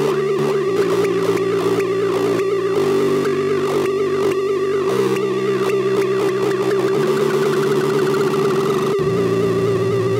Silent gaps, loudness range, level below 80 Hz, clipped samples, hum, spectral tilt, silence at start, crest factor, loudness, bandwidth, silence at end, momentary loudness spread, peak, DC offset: none; 1 LU; -56 dBFS; under 0.1%; none; -6 dB/octave; 0 s; 10 dB; -18 LUFS; 16 kHz; 0 s; 1 LU; -6 dBFS; under 0.1%